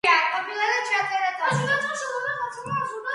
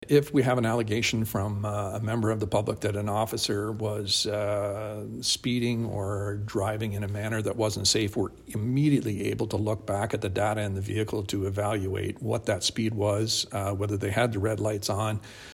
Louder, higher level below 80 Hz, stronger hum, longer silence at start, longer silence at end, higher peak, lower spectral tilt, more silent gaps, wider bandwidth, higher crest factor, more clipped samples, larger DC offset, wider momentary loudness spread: first, -24 LUFS vs -28 LUFS; second, -68 dBFS vs -54 dBFS; neither; about the same, 0.05 s vs 0 s; about the same, 0 s vs 0 s; about the same, -6 dBFS vs -8 dBFS; second, -3.5 dB/octave vs -5 dB/octave; neither; second, 11.5 kHz vs 16 kHz; about the same, 18 dB vs 18 dB; neither; neither; about the same, 7 LU vs 7 LU